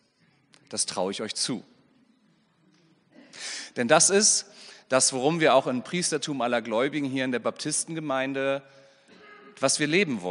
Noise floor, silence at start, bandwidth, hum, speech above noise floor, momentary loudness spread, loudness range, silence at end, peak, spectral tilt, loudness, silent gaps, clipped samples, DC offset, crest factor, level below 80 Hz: -65 dBFS; 0.7 s; 11 kHz; none; 40 dB; 13 LU; 10 LU; 0 s; -4 dBFS; -2.5 dB/octave; -25 LUFS; none; under 0.1%; under 0.1%; 24 dB; -76 dBFS